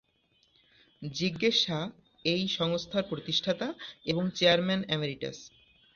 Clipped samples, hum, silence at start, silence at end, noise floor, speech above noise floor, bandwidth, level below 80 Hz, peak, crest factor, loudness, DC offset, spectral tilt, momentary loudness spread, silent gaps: under 0.1%; none; 1 s; 0.45 s; -70 dBFS; 40 dB; 7.2 kHz; -66 dBFS; -10 dBFS; 22 dB; -29 LUFS; under 0.1%; -4.5 dB/octave; 14 LU; none